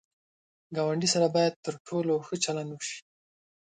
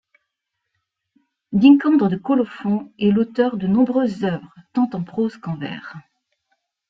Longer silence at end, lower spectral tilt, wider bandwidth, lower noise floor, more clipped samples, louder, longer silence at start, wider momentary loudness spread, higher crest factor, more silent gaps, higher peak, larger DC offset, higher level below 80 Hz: second, 0.75 s vs 0.9 s; second, -4 dB/octave vs -9 dB/octave; first, 9.4 kHz vs 6 kHz; first, under -90 dBFS vs -79 dBFS; neither; second, -29 LUFS vs -19 LUFS; second, 0.7 s vs 1.5 s; about the same, 13 LU vs 15 LU; about the same, 18 dB vs 18 dB; first, 1.56-1.63 s, 1.80-1.85 s vs none; second, -12 dBFS vs -2 dBFS; neither; second, -74 dBFS vs -60 dBFS